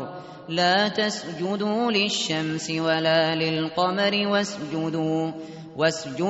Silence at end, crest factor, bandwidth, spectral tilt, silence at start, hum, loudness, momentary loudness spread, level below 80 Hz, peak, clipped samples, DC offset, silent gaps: 0 s; 16 dB; 8 kHz; -3 dB/octave; 0 s; none; -24 LUFS; 9 LU; -66 dBFS; -10 dBFS; under 0.1%; under 0.1%; none